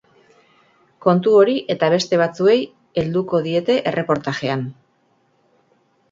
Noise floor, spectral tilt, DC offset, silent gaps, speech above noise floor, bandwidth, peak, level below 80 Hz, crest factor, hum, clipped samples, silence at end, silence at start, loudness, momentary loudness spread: -62 dBFS; -6 dB/octave; under 0.1%; none; 45 dB; 7.8 kHz; -2 dBFS; -58 dBFS; 18 dB; none; under 0.1%; 1.4 s; 1.05 s; -18 LUFS; 10 LU